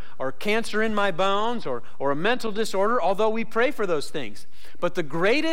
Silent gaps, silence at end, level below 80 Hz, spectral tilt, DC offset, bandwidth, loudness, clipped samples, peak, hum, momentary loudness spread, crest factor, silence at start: none; 0 s; -58 dBFS; -4.5 dB/octave; 6%; 16.5 kHz; -25 LUFS; under 0.1%; -10 dBFS; none; 9 LU; 12 dB; 0.05 s